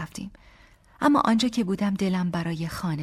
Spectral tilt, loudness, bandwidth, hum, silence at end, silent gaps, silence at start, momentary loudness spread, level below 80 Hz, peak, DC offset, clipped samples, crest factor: -6 dB/octave; -25 LUFS; 15 kHz; none; 0 s; none; 0 s; 14 LU; -54 dBFS; -8 dBFS; under 0.1%; under 0.1%; 18 dB